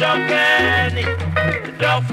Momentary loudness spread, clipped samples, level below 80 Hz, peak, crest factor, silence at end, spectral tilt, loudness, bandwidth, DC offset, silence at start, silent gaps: 7 LU; under 0.1%; -40 dBFS; -4 dBFS; 14 dB; 0 s; -5 dB/octave; -17 LUFS; 15.5 kHz; under 0.1%; 0 s; none